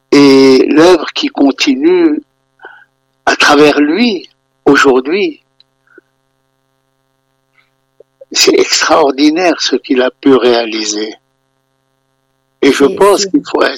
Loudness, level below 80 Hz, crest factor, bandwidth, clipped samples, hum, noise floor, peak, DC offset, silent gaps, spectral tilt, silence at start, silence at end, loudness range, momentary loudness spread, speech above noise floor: -9 LUFS; -50 dBFS; 10 dB; 16.5 kHz; 0.3%; none; -61 dBFS; 0 dBFS; under 0.1%; none; -3 dB/octave; 0.1 s; 0 s; 5 LU; 10 LU; 52 dB